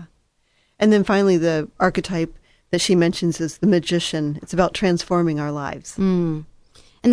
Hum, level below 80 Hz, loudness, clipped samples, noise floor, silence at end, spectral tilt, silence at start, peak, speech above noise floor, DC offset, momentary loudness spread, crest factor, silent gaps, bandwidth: none; -46 dBFS; -20 LUFS; under 0.1%; -64 dBFS; 0 s; -5.5 dB/octave; 0 s; -2 dBFS; 45 dB; under 0.1%; 9 LU; 18 dB; none; 11 kHz